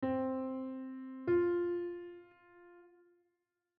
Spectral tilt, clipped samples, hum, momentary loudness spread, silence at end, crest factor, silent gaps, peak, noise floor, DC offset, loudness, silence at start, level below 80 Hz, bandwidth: -7 dB/octave; under 0.1%; none; 16 LU; 0.9 s; 16 dB; none; -22 dBFS; -85 dBFS; under 0.1%; -37 LUFS; 0 s; -76 dBFS; 4.2 kHz